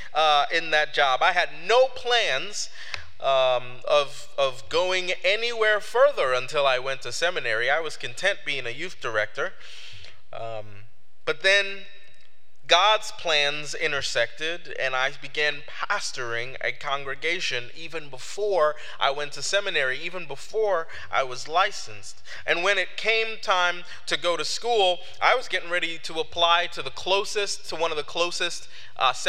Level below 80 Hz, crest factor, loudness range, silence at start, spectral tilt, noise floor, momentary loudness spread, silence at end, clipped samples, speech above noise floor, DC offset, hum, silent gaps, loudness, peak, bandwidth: -66 dBFS; 22 dB; 5 LU; 0 s; -1.5 dB/octave; -61 dBFS; 13 LU; 0 s; under 0.1%; 36 dB; 3%; none; none; -24 LUFS; -2 dBFS; 15.5 kHz